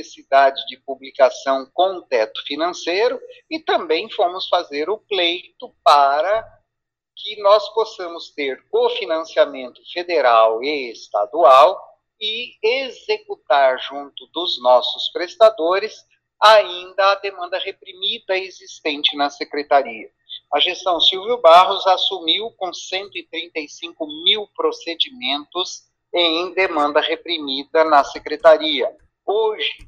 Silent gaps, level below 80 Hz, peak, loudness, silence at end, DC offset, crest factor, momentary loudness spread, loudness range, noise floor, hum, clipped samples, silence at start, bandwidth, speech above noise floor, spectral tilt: none; -64 dBFS; 0 dBFS; -18 LUFS; 0.1 s; under 0.1%; 18 dB; 15 LU; 5 LU; -81 dBFS; none; under 0.1%; 0 s; 9.6 kHz; 63 dB; -1.5 dB/octave